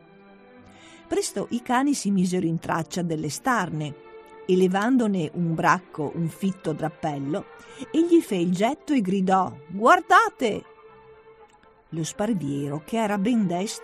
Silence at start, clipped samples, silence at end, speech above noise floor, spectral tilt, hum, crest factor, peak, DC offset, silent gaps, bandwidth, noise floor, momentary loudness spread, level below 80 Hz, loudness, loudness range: 0.95 s; under 0.1%; 0 s; 31 dB; -5.5 dB/octave; none; 20 dB; -6 dBFS; under 0.1%; none; 13.5 kHz; -54 dBFS; 11 LU; -62 dBFS; -24 LUFS; 5 LU